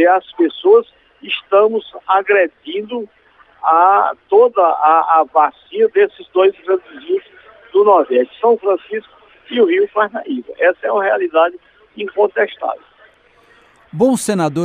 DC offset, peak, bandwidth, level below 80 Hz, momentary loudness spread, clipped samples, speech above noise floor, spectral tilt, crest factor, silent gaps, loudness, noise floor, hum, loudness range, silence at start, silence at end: under 0.1%; 0 dBFS; 13 kHz; -64 dBFS; 13 LU; under 0.1%; 36 dB; -5 dB/octave; 14 dB; none; -15 LUFS; -50 dBFS; none; 5 LU; 0 s; 0 s